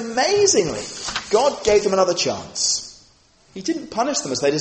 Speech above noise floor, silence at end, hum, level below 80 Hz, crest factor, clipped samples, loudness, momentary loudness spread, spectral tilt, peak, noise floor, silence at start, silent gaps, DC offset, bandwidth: 35 dB; 0 s; none; -52 dBFS; 16 dB; under 0.1%; -20 LUFS; 10 LU; -2.5 dB/octave; -4 dBFS; -54 dBFS; 0 s; none; under 0.1%; 8.8 kHz